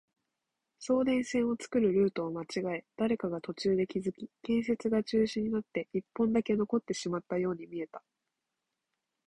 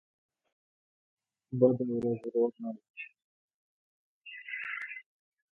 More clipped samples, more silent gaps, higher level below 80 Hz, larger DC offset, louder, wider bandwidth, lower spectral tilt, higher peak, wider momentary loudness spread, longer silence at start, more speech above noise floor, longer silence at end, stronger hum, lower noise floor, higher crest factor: neither; second, none vs 2.90-2.94 s, 3.24-4.21 s; first, -66 dBFS vs -76 dBFS; neither; about the same, -32 LUFS vs -32 LUFS; first, 11.5 kHz vs 3.9 kHz; second, -6 dB/octave vs -9 dB/octave; second, -18 dBFS vs -10 dBFS; second, 10 LU vs 20 LU; second, 0.8 s vs 1.5 s; second, 55 dB vs over 60 dB; first, 1.3 s vs 0.6 s; neither; about the same, -87 dBFS vs under -90 dBFS; second, 16 dB vs 24 dB